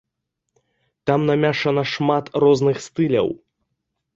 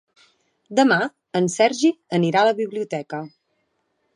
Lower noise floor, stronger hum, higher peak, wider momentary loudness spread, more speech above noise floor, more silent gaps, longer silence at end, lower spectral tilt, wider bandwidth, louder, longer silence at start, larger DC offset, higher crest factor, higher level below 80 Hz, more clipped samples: first, -79 dBFS vs -71 dBFS; neither; about the same, -4 dBFS vs -4 dBFS; second, 7 LU vs 12 LU; first, 60 dB vs 51 dB; neither; about the same, 0.8 s vs 0.9 s; first, -6.5 dB/octave vs -5 dB/octave; second, 7.8 kHz vs 11 kHz; about the same, -19 LUFS vs -20 LUFS; first, 1.05 s vs 0.7 s; neither; about the same, 16 dB vs 18 dB; first, -58 dBFS vs -74 dBFS; neither